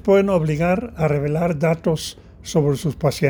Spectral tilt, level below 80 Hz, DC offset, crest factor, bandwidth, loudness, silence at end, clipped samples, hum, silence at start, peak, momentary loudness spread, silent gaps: -6.5 dB/octave; -44 dBFS; under 0.1%; 16 dB; over 20 kHz; -20 LUFS; 0 s; under 0.1%; none; 0.05 s; -2 dBFS; 7 LU; none